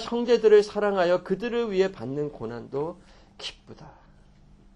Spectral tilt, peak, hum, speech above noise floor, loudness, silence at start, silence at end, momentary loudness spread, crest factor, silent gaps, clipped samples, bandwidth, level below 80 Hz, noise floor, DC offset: -6 dB/octave; -6 dBFS; none; 29 dB; -24 LUFS; 0 s; 0.85 s; 19 LU; 18 dB; none; under 0.1%; 10 kHz; -56 dBFS; -54 dBFS; under 0.1%